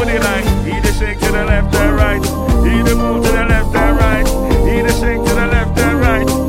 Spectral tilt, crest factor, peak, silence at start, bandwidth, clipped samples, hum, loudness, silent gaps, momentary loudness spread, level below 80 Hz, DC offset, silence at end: -5.5 dB/octave; 12 dB; 0 dBFS; 0 s; 16.5 kHz; under 0.1%; none; -14 LUFS; none; 3 LU; -16 dBFS; under 0.1%; 0 s